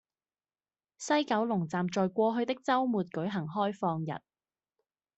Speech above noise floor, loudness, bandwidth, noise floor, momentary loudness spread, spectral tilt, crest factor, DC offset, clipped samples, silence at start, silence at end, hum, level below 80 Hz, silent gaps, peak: over 60 dB; -31 LUFS; 8.2 kHz; under -90 dBFS; 7 LU; -6 dB/octave; 18 dB; under 0.1%; under 0.1%; 1 s; 1 s; none; -76 dBFS; none; -16 dBFS